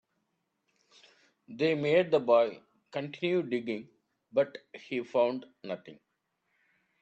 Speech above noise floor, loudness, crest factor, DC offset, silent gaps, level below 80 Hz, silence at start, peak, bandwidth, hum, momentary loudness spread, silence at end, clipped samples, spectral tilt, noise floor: 50 dB; -30 LUFS; 20 dB; under 0.1%; none; -80 dBFS; 1.5 s; -12 dBFS; 8 kHz; none; 15 LU; 1.1 s; under 0.1%; -7 dB/octave; -80 dBFS